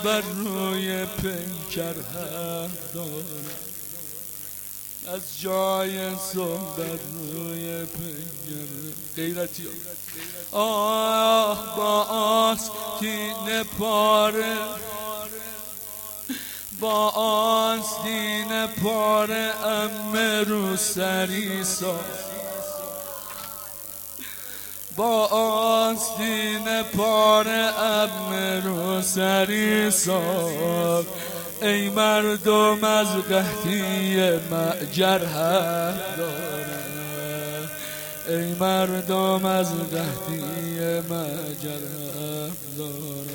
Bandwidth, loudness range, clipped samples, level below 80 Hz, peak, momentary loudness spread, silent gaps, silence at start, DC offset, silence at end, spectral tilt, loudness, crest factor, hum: 18 kHz; 9 LU; under 0.1%; -58 dBFS; -4 dBFS; 13 LU; none; 0 s; under 0.1%; 0 s; -3.5 dB/octave; -24 LUFS; 20 dB; none